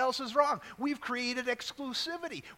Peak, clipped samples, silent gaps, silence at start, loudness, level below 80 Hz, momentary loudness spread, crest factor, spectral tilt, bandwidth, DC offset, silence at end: -12 dBFS; under 0.1%; none; 0 s; -33 LUFS; -70 dBFS; 7 LU; 20 dB; -2.5 dB/octave; 16.5 kHz; under 0.1%; 0.05 s